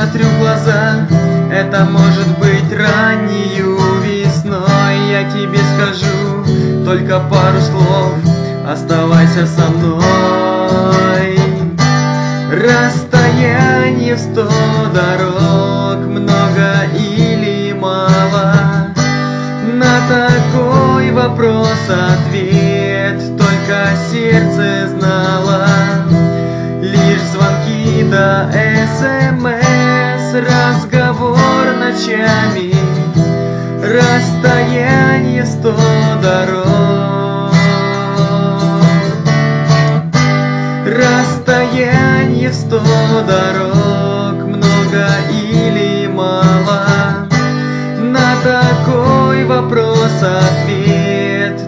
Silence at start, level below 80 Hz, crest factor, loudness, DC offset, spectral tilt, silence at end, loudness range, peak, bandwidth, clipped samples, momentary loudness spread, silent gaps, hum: 0 s; -38 dBFS; 10 dB; -11 LUFS; under 0.1%; -6.5 dB/octave; 0 s; 1 LU; 0 dBFS; 7.8 kHz; under 0.1%; 4 LU; none; none